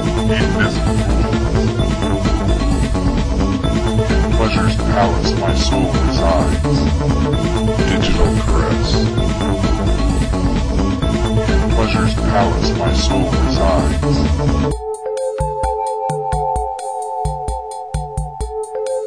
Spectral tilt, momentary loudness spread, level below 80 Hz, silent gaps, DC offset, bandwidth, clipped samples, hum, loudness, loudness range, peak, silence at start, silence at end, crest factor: -6 dB/octave; 7 LU; -20 dBFS; none; under 0.1%; 10.5 kHz; under 0.1%; none; -17 LUFS; 4 LU; -2 dBFS; 0 s; 0 s; 12 dB